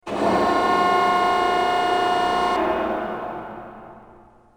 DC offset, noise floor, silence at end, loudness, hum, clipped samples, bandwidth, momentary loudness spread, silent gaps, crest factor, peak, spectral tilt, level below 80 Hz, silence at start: under 0.1%; -49 dBFS; 0.5 s; -20 LUFS; none; under 0.1%; over 20 kHz; 15 LU; none; 14 dB; -8 dBFS; -4.5 dB/octave; -50 dBFS; 0.05 s